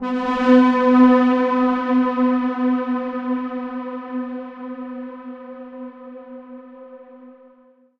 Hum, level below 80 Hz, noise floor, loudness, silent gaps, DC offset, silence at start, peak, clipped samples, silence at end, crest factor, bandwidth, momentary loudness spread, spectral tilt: none; -56 dBFS; -53 dBFS; -18 LUFS; none; under 0.1%; 0 s; -2 dBFS; under 0.1%; 0.7 s; 18 dB; 5.8 kHz; 23 LU; -6.5 dB/octave